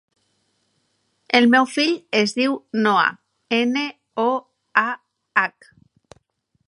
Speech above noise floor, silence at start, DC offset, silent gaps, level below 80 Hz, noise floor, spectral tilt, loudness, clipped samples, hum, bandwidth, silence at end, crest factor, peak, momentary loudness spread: 50 dB; 1.3 s; under 0.1%; none; -74 dBFS; -69 dBFS; -4 dB/octave; -20 LUFS; under 0.1%; none; 11 kHz; 1.2 s; 20 dB; -2 dBFS; 10 LU